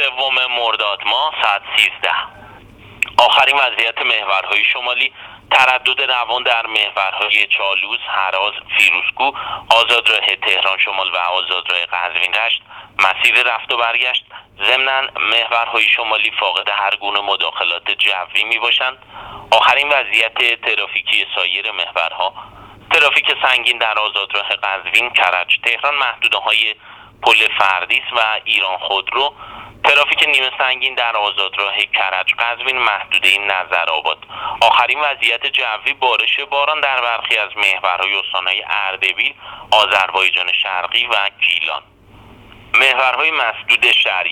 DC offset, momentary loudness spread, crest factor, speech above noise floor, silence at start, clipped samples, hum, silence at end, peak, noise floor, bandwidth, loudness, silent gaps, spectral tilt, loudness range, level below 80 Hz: under 0.1%; 7 LU; 16 dB; 26 dB; 0 s; under 0.1%; none; 0 s; 0 dBFS; -42 dBFS; over 20 kHz; -14 LUFS; none; -0.5 dB/octave; 2 LU; -56 dBFS